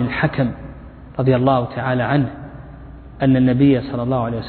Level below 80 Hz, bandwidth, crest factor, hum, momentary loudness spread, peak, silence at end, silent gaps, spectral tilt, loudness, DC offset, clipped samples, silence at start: -40 dBFS; 4.5 kHz; 16 dB; none; 22 LU; -2 dBFS; 0 s; none; -11.5 dB/octave; -18 LUFS; under 0.1%; under 0.1%; 0 s